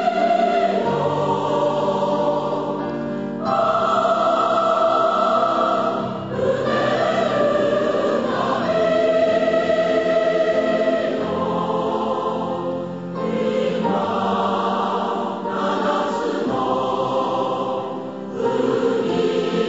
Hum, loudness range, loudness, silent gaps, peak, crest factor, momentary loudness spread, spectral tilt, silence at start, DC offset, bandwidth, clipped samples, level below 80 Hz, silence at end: none; 3 LU; -20 LUFS; none; -6 dBFS; 14 dB; 7 LU; -6 dB/octave; 0 s; 0.2%; 8 kHz; under 0.1%; -58 dBFS; 0 s